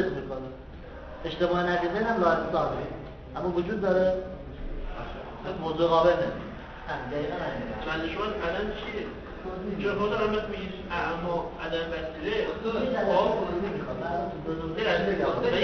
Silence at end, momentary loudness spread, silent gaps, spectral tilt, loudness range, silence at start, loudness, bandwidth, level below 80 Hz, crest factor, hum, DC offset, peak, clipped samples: 0 s; 14 LU; none; -7 dB/octave; 3 LU; 0 s; -29 LUFS; 6.6 kHz; -44 dBFS; 18 dB; none; under 0.1%; -10 dBFS; under 0.1%